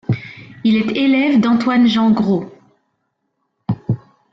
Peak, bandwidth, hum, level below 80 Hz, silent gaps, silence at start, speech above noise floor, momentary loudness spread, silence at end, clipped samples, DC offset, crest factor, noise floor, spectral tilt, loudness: -6 dBFS; 7.4 kHz; none; -54 dBFS; none; 0.1 s; 57 dB; 12 LU; 0.35 s; under 0.1%; under 0.1%; 12 dB; -71 dBFS; -7.5 dB/octave; -16 LUFS